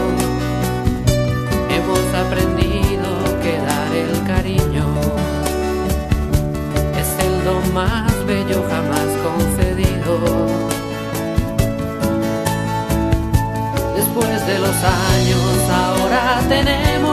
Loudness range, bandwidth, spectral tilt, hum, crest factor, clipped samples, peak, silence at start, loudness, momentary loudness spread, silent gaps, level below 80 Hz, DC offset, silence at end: 3 LU; 14 kHz; -5.5 dB/octave; none; 16 dB; under 0.1%; 0 dBFS; 0 s; -18 LUFS; 4 LU; none; -26 dBFS; under 0.1%; 0 s